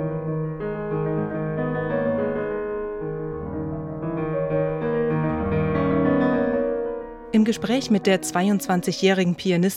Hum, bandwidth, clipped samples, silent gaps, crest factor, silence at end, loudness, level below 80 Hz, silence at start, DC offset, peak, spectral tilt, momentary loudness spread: none; 16 kHz; under 0.1%; none; 16 dB; 0 s; -24 LUFS; -46 dBFS; 0 s; under 0.1%; -6 dBFS; -6 dB/octave; 9 LU